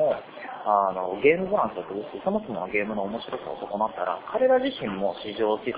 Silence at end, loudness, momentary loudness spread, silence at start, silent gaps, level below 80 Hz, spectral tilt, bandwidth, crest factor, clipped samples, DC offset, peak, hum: 0 s; -26 LUFS; 11 LU; 0 s; none; -62 dBFS; -9 dB/octave; 4 kHz; 20 dB; under 0.1%; under 0.1%; -6 dBFS; none